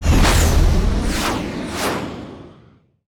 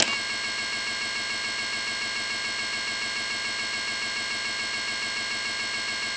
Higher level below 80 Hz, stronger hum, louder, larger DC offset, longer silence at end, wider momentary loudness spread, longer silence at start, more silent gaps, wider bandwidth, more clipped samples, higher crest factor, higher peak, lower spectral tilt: first, -20 dBFS vs -62 dBFS; neither; first, -19 LUFS vs -27 LUFS; neither; first, 0.6 s vs 0 s; first, 18 LU vs 0 LU; about the same, 0 s vs 0 s; neither; first, 19.5 kHz vs 8 kHz; neither; second, 12 dB vs 26 dB; about the same, -6 dBFS vs -4 dBFS; first, -4.5 dB/octave vs 0 dB/octave